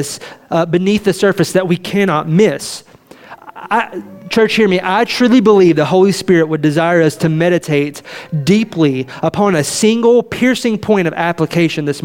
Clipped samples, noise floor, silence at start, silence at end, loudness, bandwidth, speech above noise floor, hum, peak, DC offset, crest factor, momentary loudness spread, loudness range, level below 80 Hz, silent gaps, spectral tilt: under 0.1%; -38 dBFS; 0 s; 0.05 s; -13 LUFS; 17 kHz; 25 dB; none; 0 dBFS; under 0.1%; 12 dB; 9 LU; 4 LU; -52 dBFS; none; -5.5 dB/octave